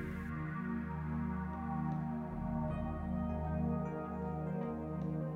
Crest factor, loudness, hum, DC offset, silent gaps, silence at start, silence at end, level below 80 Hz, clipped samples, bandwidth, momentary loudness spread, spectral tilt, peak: 12 dB; -39 LUFS; none; under 0.1%; none; 0 s; 0 s; -48 dBFS; under 0.1%; 4.3 kHz; 3 LU; -10 dB/octave; -26 dBFS